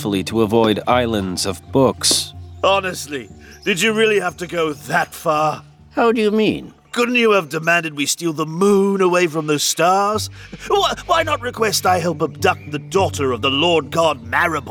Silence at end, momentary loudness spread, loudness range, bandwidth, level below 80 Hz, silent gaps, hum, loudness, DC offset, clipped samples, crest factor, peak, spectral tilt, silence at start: 0 s; 8 LU; 2 LU; 19.5 kHz; -48 dBFS; none; none; -17 LUFS; under 0.1%; under 0.1%; 16 dB; -2 dBFS; -3.5 dB/octave; 0 s